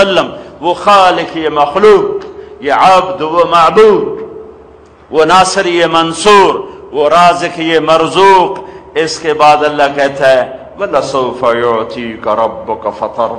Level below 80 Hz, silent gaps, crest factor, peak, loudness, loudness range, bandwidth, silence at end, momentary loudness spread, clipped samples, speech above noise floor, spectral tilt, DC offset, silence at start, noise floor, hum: -44 dBFS; none; 10 dB; 0 dBFS; -9 LUFS; 3 LU; 11.5 kHz; 0 s; 13 LU; under 0.1%; 28 dB; -4 dB/octave; under 0.1%; 0 s; -38 dBFS; none